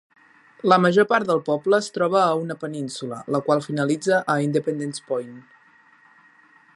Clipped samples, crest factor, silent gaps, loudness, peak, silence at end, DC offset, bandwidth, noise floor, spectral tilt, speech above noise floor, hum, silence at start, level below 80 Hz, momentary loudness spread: under 0.1%; 22 dB; none; -22 LUFS; -2 dBFS; 1.35 s; under 0.1%; 11.5 kHz; -55 dBFS; -5.5 dB/octave; 33 dB; none; 0.65 s; -74 dBFS; 12 LU